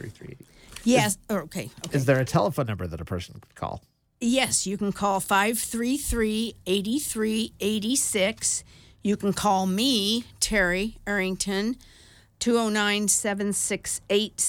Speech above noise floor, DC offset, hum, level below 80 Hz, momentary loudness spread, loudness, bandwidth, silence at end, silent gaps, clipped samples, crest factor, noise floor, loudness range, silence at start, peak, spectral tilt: 21 dB; under 0.1%; none; -48 dBFS; 12 LU; -25 LUFS; 19 kHz; 0 s; none; under 0.1%; 20 dB; -46 dBFS; 2 LU; 0 s; -6 dBFS; -3.5 dB/octave